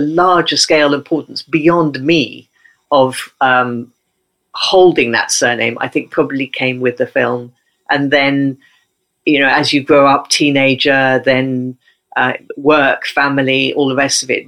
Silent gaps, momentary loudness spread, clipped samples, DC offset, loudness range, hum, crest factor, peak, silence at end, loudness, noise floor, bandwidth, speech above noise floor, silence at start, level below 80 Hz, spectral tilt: none; 9 LU; under 0.1%; under 0.1%; 3 LU; none; 14 dB; 0 dBFS; 0.05 s; -13 LUFS; -68 dBFS; 15.5 kHz; 55 dB; 0 s; -54 dBFS; -3.5 dB/octave